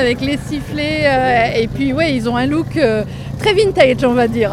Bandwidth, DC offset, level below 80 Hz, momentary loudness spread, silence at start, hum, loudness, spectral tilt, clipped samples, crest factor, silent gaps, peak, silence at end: 15.5 kHz; under 0.1%; -34 dBFS; 8 LU; 0 s; none; -15 LUFS; -6 dB/octave; under 0.1%; 14 dB; none; 0 dBFS; 0 s